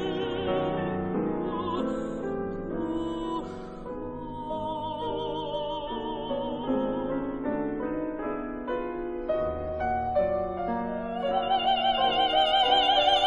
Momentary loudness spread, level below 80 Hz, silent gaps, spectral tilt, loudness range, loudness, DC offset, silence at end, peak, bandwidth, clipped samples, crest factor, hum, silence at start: 11 LU; -48 dBFS; none; -6 dB/octave; 8 LU; -28 LUFS; under 0.1%; 0 s; -10 dBFS; 9.6 kHz; under 0.1%; 18 dB; none; 0 s